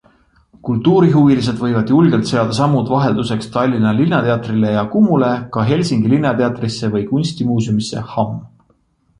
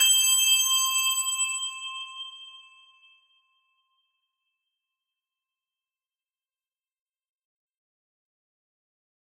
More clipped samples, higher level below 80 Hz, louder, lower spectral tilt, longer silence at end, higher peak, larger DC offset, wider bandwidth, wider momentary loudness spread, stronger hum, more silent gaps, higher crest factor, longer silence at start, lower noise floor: neither; first, -48 dBFS vs -82 dBFS; first, -15 LUFS vs -21 LUFS; first, -7 dB/octave vs 7.5 dB/octave; second, 0.75 s vs 6.6 s; first, -2 dBFS vs -10 dBFS; neither; second, 11 kHz vs 16 kHz; second, 8 LU vs 20 LU; neither; neither; second, 14 dB vs 22 dB; first, 0.65 s vs 0 s; second, -58 dBFS vs under -90 dBFS